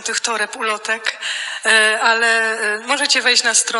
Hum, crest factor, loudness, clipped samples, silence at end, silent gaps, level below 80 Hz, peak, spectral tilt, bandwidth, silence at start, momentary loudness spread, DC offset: none; 16 dB; -15 LUFS; under 0.1%; 0 s; none; -72 dBFS; 0 dBFS; 1.5 dB/octave; 12 kHz; 0 s; 9 LU; under 0.1%